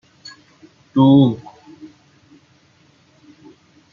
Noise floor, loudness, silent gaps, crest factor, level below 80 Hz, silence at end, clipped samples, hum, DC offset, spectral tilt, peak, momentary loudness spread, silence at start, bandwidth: -54 dBFS; -14 LUFS; none; 18 dB; -60 dBFS; 2.55 s; under 0.1%; none; under 0.1%; -9 dB/octave; -2 dBFS; 28 LU; 0.95 s; 7.2 kHz